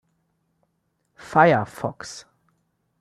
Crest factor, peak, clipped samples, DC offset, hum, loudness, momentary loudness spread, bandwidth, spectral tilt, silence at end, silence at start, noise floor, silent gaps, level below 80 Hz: 24 dB; -2 dBFS; under 0.1%; under 0.1%; none; -20 LUFS; 21 LU; 13.5 kHz; -6 dB/octave; 0.8 s; 1.3 s; -72 dBFS; none; -64 dBFS